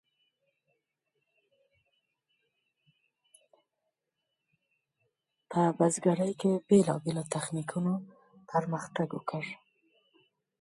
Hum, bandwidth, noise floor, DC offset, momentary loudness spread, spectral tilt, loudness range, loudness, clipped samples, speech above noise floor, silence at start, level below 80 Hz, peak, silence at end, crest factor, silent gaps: none; 11.5 kHz; -85 dBFS; under 0.1%; 12 LU; -6 dB/octave; 7 LU; -30 LUFS; under 0.1%; 56 dB; 5.5 s; -76 dBFS; -12 dBFS; 1.05 s; 22 dB; none